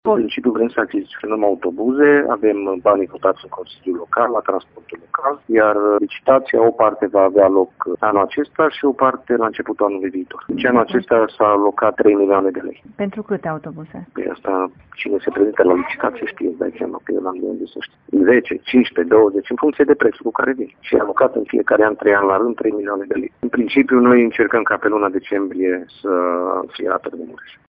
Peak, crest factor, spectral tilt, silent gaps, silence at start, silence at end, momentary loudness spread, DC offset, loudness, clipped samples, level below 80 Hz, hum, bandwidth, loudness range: 0 dBFS; 16 dB; -9.5 dB/octave; none; 0.05 s; 0.2 s; 12 LU; under 0.1%; -17 LUFS; under 0.1%; -58 dBFS; none; 5 kHz; 5 LU